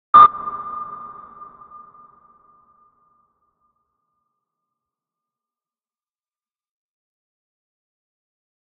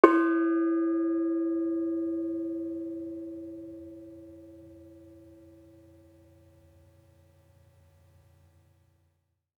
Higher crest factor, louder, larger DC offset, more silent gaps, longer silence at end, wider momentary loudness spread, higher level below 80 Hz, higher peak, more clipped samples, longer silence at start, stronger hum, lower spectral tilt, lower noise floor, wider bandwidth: second, 24 dB vs 30 dB; first, -15 LUFS vs -29 LUFS; neither; neither; first, 7.65 s vs 4.4 s; first, 31 LU vs 25 LU; first, -60 dBFS vs -74 dBFS; about the same, 0 dBFS vs -2 dBFS; neither; about the same, 0.15 s vs 0.05 s; neither; second, -1.5 dB/octave vs -7.5 dB/octave; first, under -90 dBFS vs -75 dBFS; second, 4.4 kHz vs 4.9 kHz